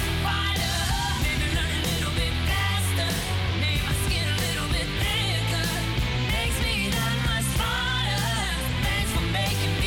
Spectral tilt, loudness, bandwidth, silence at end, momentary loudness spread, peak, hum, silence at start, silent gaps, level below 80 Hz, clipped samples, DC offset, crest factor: -4 dB/octave; -25 LUFS; 17.5 kHz; 0 s; 2 LU; -10 dBFS; none; 0 s; none; -32 dBFS; under 0.1%; under 0.1%; 14 dB